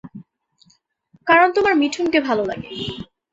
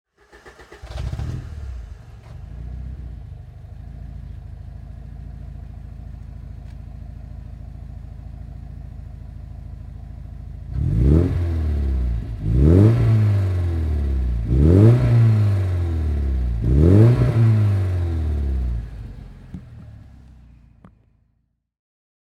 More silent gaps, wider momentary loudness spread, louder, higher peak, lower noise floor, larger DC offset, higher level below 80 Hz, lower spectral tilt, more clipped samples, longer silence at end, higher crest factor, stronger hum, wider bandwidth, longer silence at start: neither; second, 16 LU vs 24 LU; about the same, -18 LUFS vs -19 LUFS; about the same, -2 dBFS vs -2 dBFS; second, -60 dBFS vs -68 dBFS; neither; second, -54 dBFS vs -28 dBFS; second, -4.5 dB/octave vs -10 dB/octave; neither; second, 0.3 s vs 2.35 s; about the same, 18 dB vs 18 dB; neither; first, 8 kHz vs 5.8 kHz; second, 0.05 s vs 0.45 s